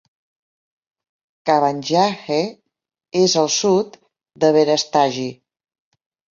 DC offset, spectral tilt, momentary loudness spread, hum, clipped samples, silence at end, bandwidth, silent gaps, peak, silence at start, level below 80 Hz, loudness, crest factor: under 0.1%; -4 dB/octave; 12 LU; none; under 0.1%; 1 s; 7.6 kHz; none; -2 dBFS; 1.45 s; -66 dBFS; -18 LUFS; 18 dB